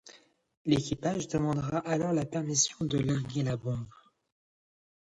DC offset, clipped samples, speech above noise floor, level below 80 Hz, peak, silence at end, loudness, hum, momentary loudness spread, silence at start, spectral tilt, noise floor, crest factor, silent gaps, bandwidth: under 0.1%; under 0.1%; 28 dB; -58 dBFS; -14 dBFS; 1.2 s; -31 LUFS; none; 8 LU; 0.05 s; -5 dB/octave; -58 dBFS; 18 dB; 0.57-0.65 s; 11 kHz